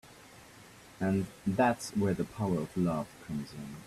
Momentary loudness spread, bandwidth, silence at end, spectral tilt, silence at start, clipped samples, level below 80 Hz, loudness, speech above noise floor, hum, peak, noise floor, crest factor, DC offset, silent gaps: 24 LU; 14 kHz; 0 s; -6.5 dB/octave; 0.05 s; under 0.1%; -62 dBFS; -33 LUFS; 22 dB; none; -16 dBFS; -54 dBFS; 18 dB; under 0.1%; none